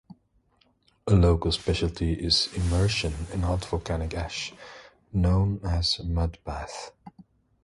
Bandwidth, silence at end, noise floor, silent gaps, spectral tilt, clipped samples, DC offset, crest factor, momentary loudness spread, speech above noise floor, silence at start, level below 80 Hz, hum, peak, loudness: 11.5 kHz; 0.55 s; -66 dBFS; none; -5.5 dB/octave; under 0.1%; under 0.1%; 18 dB; 14 LU; 41 dB; 1.05 s; -34 dBFS; none; -8 dBFS; -26 LUFS